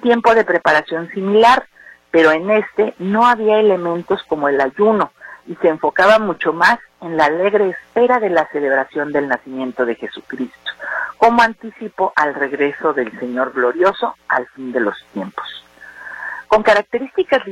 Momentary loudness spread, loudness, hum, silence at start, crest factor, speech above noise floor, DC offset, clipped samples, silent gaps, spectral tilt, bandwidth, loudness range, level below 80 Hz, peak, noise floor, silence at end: 15 LU; -16 LUFS; none; 0.05 s; 14 dB; 20 dB; under 0.1%; under 0.1%; none; -5.5 dB/octave; 12 kHz; 5 LU; -54 dBFS; -2 dBFS; -35 dBFS; 0 s